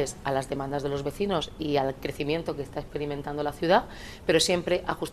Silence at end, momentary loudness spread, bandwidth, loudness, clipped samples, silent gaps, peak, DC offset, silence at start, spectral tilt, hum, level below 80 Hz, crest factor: 0 s; 10 LU; 13.5 kHz; -28 LUFS; under 0.1%; none; -8 dBFS; under 0.1%; 0 s; -4.5 dB/octave; none; -48 dBFS; 20 dB